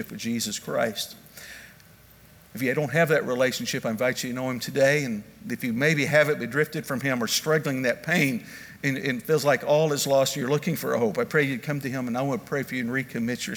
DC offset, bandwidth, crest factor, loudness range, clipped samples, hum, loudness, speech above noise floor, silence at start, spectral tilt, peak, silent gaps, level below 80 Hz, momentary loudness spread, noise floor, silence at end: under 0.1%; over 20 kHz; 20 dB; 3 LU; under 0.1%; none; -25 LUFS; 27 dB; 0 s; -4.5 dB/octave; -6 dBFS; none; -64 dBFS; 10 LU; -52 dBFS; 0 s